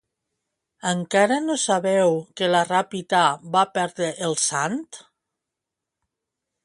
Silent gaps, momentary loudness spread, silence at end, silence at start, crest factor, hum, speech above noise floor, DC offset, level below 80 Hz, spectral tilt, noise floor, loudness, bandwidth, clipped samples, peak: none; 7 LU; 1.65 s; 0.85 s; 20 dB; none; 63 dB; under 0.1%; -72 dBFS; -3.5 dB/octave; -85 dBFS; -22 LUFS; 11.5 kHz; under 0.1%; -4 dBFS